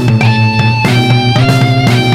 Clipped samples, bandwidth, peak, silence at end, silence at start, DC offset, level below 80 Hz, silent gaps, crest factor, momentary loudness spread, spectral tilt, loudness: under 0.1%; 13.5 kHz; 0 dBFS; 0 s; 0 s; 0.6%; -34 dBFS; none; 8 dB; 1 LU; -6 dB/octave; -9 LUFS